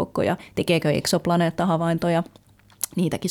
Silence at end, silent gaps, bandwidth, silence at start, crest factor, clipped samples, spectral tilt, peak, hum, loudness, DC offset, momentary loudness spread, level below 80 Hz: 0 s; none; 18 kHz; 0 s; 18 dB; under 0.1%; -5.5 dB/octave; -6 dBFS; none; -23 LUFS; under 0.1%; 6 LU; -54 dBFS